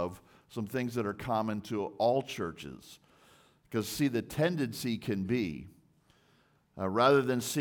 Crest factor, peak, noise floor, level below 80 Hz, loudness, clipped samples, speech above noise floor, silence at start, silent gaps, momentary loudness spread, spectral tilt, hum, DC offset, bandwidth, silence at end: 22 dB; -12 dBFS; -68 dBFS; -66 dBFS; -32 LUFS; under 0.1%; 36 dB; 0 s; none; 15 LU; -5.5 dB/octave; none; under 0.1%; 19 kHz; 0 s